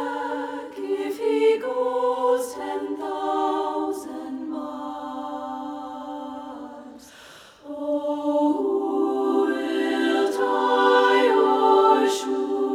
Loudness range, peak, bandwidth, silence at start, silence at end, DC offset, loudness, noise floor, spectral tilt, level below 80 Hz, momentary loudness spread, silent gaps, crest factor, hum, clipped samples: 13 LU; -6 dBFS; 15 kHz; 0 s; 0 s; under 0.1%; -23 LUFS; -47 dBFS; -3 dB/octave; -68 dBFS; 16 LU; none; 18 dB; none; under 0.1%